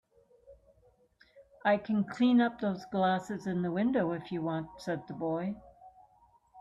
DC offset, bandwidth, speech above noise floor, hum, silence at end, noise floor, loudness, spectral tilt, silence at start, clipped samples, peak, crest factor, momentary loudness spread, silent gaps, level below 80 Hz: under 0.1%; 7.8 kHz; 36 dB; none; 0 s; -66 dBFS; -32 LUFS; -7.5 dB/octave; 0.5 s; under 0.1%; -16 dBFS; 18 dB; 11 LU; none; -68 dBFS